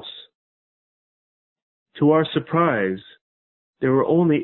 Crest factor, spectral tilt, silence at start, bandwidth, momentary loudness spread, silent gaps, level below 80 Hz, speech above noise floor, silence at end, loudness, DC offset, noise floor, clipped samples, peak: 18 dB; -11.5 dB/octave; 0.05 s; 4.2 kHz; 16 LU; 0.35-1.56 s, 1.62-1.86 s, 3.21-3.73 s; -62 dBFS; over 71 dB; 0 s; -20 LUFS; under 0.1%; under -90 dBFS; under 0.1%; -6 dBFS